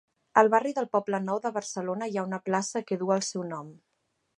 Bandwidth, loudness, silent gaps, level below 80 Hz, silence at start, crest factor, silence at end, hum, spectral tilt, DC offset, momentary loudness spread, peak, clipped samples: 11.5 kHz; -28 LUFS; none; -82 dBFS; 0.35 s; 24 dB; 0.65 s; none; -4.5 dB/octave; under 0.1%; 11 LU; -4 dBFS; under 0.1%